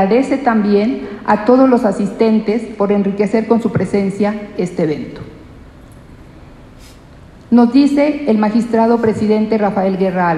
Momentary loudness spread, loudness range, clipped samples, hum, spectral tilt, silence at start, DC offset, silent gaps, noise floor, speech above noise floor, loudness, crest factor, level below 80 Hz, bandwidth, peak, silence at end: 8 LU; 8 LU; under 0.1%; none; -7.5 dB/octave; 0 s; under 0.1%; none; -39 dBFS; 26 dB; -14 LUFS; 14 dB; -46 dBFS; 10.5 kHz; 0 dBFS; 0 s